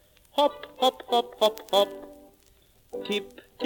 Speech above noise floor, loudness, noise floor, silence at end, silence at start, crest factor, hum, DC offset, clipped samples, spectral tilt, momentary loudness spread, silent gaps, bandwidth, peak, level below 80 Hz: 34 dB; -26 LUFS; -60 dBFS; 0 s; 0.35 s; 20 dB; none; under 0.1%; under 0.1%; -3 dB/octave; 16 LU; none; 18 kHz; -8 dBFS; -64 dBFS